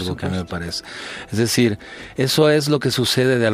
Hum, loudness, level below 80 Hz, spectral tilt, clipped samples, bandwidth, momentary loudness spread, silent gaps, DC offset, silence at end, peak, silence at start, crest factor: none; -19 LUFS; -48 dBFS; -4.5 dB/octave; under 0.1%; 15.5 kHz; 15 LU; none; under 0.1%; 0 s; -4 dBFS; 0 s; 16 dB